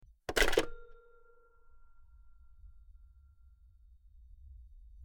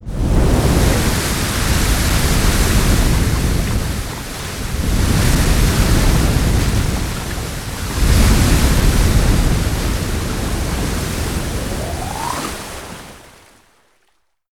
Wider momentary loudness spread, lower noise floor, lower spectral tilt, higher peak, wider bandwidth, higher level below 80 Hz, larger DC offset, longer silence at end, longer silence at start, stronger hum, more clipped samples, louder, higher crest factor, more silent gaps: first, 29 LU vs 10 LU; about the same, -61 dBFS vs -64 dBFS; second, -2.5 dB/octave vs -4.5 dB/octave; second, -12 dBFS vs 0 dBFS; about the same, 19.5 kHz vs 18 kHz; second, -46 dBFS vs -18 dBFS; neither; second, 0 s vs 1.35 s; first, 0.3 s vs 0 s; neither; neither; second, -32 LUFS vs -17 LUFS; first, 28 dB vs 16 dB; neither